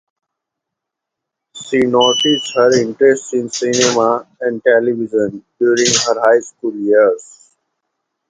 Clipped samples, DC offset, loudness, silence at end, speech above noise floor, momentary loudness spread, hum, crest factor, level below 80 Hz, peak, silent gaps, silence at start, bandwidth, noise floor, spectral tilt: under 0.1%; under 0.1%; -14 LUFS; 1.05 s; 67 dB; 9 LU; none; 16 dB; -60 dBFS; 0 dBFS; none; 1.55 s; 9.6 kHz; -81 dBFS; -3 dB/octave